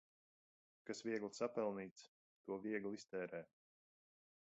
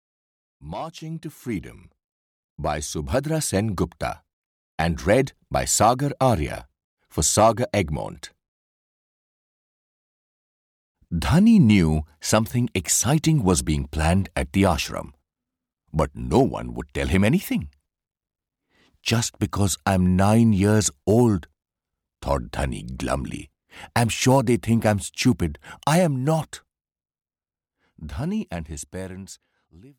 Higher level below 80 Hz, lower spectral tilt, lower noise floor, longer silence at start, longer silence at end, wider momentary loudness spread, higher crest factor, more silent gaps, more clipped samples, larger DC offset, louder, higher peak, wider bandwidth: second, -88 dBFS vs -40 dBFS; about the same, -4.5 dB/octave vs -5 dB/octave; about the same, under -90 dBFS vs under -90 dBFS; first, 0.85 s vs 0.6 s; first, 1.05 s vs 0.1 s; about the same, 17 LU vs 16 LU; about the same, 20 dB vs 18 dB; second, 1.91-1.96 s, 2.08-2.44 s vs 2.04-2.56 s, 4.33-4.78 s, 6.84-6.97 s, 8.48-10.95 s; neither; neither; second, -47 LUFS vs -22 LUFS; second, -28 dBFS vs -6 dBFS; second, 8 kHz vs 18.5 kHz